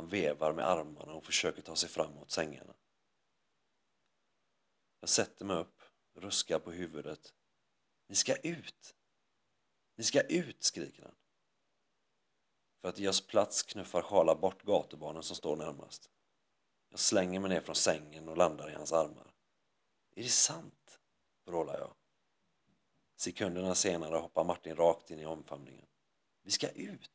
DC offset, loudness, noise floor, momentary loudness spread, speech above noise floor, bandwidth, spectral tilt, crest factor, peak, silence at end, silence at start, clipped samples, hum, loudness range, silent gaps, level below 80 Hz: under 0.1%; -34 LUFS; -83 dBFS; 16 LU; 48 dB; 8 kHz; -2.5 dB/octave; 24 dB; -14 dBFS; 0.1 s; 0 s; under 0.1%; none; 6 LU; none; -70 dBFS